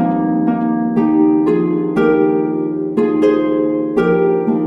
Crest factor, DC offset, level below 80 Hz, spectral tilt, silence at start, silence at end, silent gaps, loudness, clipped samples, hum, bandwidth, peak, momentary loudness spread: 12 dB; under 0.1%; -50 dBFS; -9.5 dB/octave; 0 s; 0 s; none; -15 LUFS; under 0.1%; none; 5.6 kHz; -2 dBFS; 4 LU